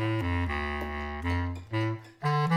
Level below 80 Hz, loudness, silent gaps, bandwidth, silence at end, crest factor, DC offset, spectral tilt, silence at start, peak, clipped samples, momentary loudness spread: -42 dBFS; -31 LUFS; none; 11 kHz; 0 s; 14 dB; under 0.1%; -7.5 dB/octave; 0 s; -14 dBFS; under 0.1%; 5 LU